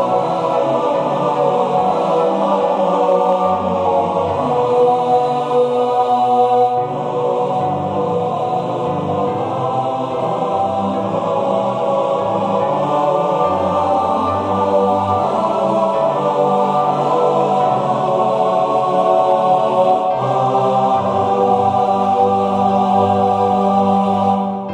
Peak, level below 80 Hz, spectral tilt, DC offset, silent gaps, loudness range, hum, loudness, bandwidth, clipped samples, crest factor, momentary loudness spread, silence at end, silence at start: -2 dBFS; -58 dBFS; -7.5 dB/octave; under 0.1%; none; 4 LU; none; -16 LUFS; 9.6 kHz; under 0.1%; 12 dB; 5 LU; 0 s; 0 s